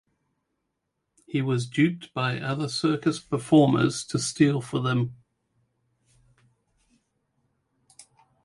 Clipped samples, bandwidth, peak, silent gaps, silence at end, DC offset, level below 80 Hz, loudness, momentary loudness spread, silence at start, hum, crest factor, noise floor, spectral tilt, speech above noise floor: under 0.1%; 11.5 kHz; -6 dBFS; none; 3.3 s; under 0.1%; -64 dBFS; -25 LUFS; 9 LU; 1.3 s; none; 20 dB; -80 dBFS; -6 dB/octave; 56 dB